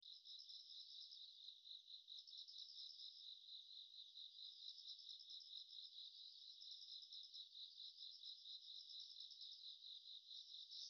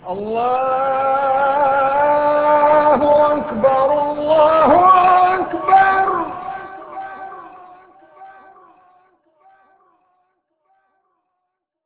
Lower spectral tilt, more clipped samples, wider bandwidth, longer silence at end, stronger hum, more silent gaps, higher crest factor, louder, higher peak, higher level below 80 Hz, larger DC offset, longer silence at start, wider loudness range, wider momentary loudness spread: second, 6 dB/octave vs -8.5 dB/octave; neither; first, 6.6 kHz vs 4 kHz; second, 0 s vs 3.6 s; neither; neither; about the same, 16 dB vs 16 dB; second, -56 LUFS vs -14 LUFS; second, -44 dBFS vs -2 dBFS; second, under -90 dBFS vs -52 dBFS; neither; about the same, 0 s vs 0.05 s; second, 1 LU vs 11 LU; second, 3 LU vs 19 LU